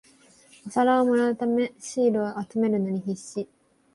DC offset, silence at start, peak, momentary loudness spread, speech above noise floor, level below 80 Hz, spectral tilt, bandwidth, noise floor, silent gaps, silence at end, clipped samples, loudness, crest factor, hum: under 0.1%; 0.65 s; -10 dBFS; 14 LU; 31 dB; -68 dBFS; -6 dB/octave; 11.5 kHz; -56 dBFS; none; 0.5 s; under 0.1%; -25 LUFS; 14 dB; none